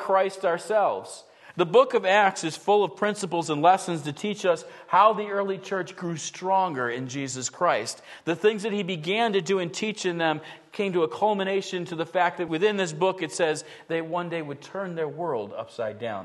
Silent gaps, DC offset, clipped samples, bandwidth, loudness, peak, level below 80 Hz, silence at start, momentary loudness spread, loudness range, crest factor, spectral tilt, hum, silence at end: none; under 0.1%; under 0.1%; 12.5 kHz; -26 LUFS; -6 dBFS; -76 dBFS; 0 s; 12 LU; 4 LU; 20 dB; -4 dB/octave; none; 0 s